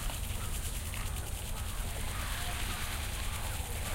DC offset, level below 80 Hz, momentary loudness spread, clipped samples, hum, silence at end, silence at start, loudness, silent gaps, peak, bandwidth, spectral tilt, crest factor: under 0.1%; -38 dBFS; 3 LU; under 0.1%; none; 0 s; 0 s; -37 LUFS; none; -22 dBFS; 17 kHz; -3 dB/octave; 14 dB